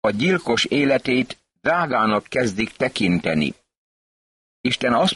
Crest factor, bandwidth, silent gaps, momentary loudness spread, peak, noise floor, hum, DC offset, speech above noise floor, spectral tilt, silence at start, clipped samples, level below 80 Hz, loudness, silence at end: 14 dB; 11.5 kHz; 3.77-4.64 s; 6 LU; -6 dBFS; under -90 dBFS; none; under 0.1%; over 70 dB; -5 dB/octave; 0.05 s; under 0.1%; -52 dBFS; -21 LUFS; 0 s